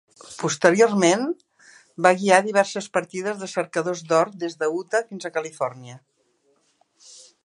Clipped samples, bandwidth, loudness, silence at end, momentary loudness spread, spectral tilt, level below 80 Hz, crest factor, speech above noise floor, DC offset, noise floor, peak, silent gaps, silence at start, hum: under 0.1%; 11.5 kHz; -22 LUFS; 1.5 s; 12 LU; -4 dB/octave; -76 dBFS; 24 dB; 44 dB; under 0.1%; -66 dBFS; 0 dBFS; none; 0.3 s; none